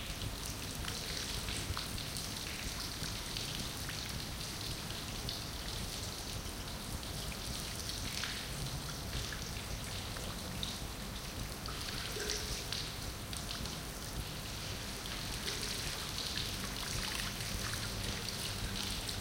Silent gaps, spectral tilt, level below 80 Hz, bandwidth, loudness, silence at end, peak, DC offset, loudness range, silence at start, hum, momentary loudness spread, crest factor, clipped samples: none; -2.5 dB/octave; -48 dBFS; 17 kHz; -39 LUFS; 0 s; -20 dBFS; under 0.1%; 3 LU; 0 s; none; 4 LU; 22 dB; under 0.1%